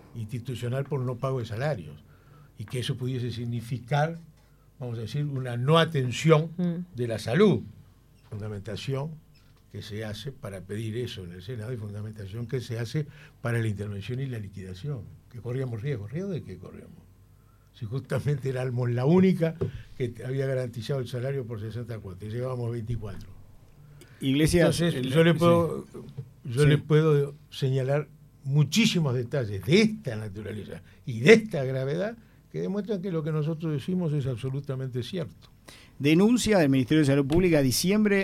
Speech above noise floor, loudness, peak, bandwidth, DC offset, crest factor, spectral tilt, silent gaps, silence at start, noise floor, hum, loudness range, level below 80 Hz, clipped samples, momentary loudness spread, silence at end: 30 dB; -27 LUFS; -4 dBFS; 15.5 kHz; under 0.1%; 24 dB; -6 dB/octave; none; 0.15 s; -57 dBFS; none; 11 LU; -52 dBFS; under 0.1%; 17 LU; 0 s